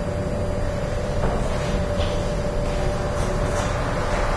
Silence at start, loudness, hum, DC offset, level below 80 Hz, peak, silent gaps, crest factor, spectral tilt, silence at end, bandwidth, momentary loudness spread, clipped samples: 0 s; -25 LUFS; none; under 0.1%; -26 dBFS; -10 dBFS; none; 14 dB; -6 dB/octave; 0 s; 11 kHz; 2 LU; under 0.1%